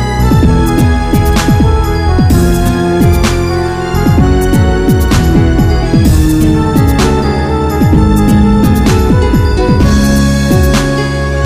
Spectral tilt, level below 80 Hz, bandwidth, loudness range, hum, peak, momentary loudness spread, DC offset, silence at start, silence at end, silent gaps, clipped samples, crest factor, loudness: -6.5 dB/octave; -14 dBFS; 15.5 kHz; 1 LU; none; 0 dBFS; 4 LU; 1%; 0 s; 0 s; none; under 0.1%; 8 dB; -9 LUFS